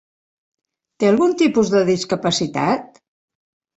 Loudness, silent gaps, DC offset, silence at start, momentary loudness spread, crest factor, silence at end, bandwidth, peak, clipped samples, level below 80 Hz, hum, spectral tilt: -18 LUFS; none; under 0.1%; 1 s; 5 LU; 16 dB; 0.9 s; 8.2 kHz; -4 dBFS; under 0.1%; -58 dBFS; none; -5 dB/octave